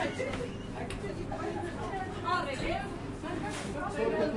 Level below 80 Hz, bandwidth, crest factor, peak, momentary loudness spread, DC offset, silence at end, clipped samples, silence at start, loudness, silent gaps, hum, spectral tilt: -48 dBFS; 11.5 kHz; 16 dB; -18 dBFS; 7 LU; under 0.1%; 0 s; under 0.1%; 0 s; -35 LUFS; none; none; -5.5 dB/octave